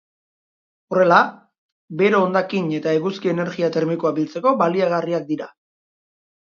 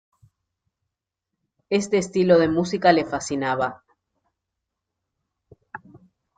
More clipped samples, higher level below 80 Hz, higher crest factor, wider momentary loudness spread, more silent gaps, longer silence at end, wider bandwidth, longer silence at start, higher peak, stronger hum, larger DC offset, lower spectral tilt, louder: neither; second, -70 dBFS vs -60 dBFS; about the same, 20 dB vs 22 dB; second, 9 LU vs 24 LU; first, 1.58-1.88 s vs none; first, 1 s vs 0.4 s; second, 7.2 kHz vs 9.4 kHz; second, 0.9 s vs 1.7 s; first, 0 dBFS vs -4 dBFS; neither; neither; first, -7 dB/octave vs -5.5 dB/octave; about the same, -19 LUFS vs -21 LUFS